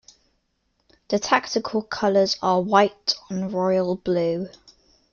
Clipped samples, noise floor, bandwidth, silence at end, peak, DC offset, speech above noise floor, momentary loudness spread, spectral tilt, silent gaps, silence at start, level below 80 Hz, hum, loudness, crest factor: under 0.1%; -71 dBFS; 7.2 kHz; 0.65 s; -4 dBFS; under 0.1%; 49 dB; 8 LU; -4.5 dB/octave; none; 1.1 s; -60 dBFS; none; -22 LUFS; 20 dB